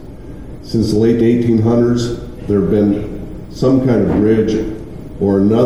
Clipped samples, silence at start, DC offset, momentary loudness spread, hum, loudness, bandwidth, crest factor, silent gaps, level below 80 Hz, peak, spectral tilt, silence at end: under 0.1%; 0 s; 1%; 17 LU; none; -14 LUFS; 12.5 kHz; 12 dB; none; -34 dBFS; -2 dBFS; -8 dB/octave; 0 s